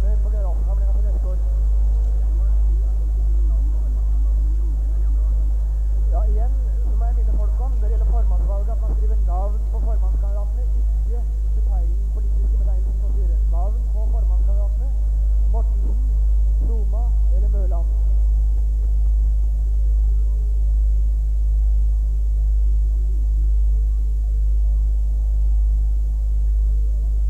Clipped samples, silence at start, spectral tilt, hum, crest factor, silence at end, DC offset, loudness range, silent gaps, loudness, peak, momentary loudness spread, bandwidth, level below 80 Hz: under 0.1%; 0 s; -9.5 dB/octave; 50 Hz at -35 dBFS; 6 dB; 0 s; 1%; 1 LU; none; -22 LUFS; -10 dBFS; 2 LU; 1.3 kHz; -18 dBFS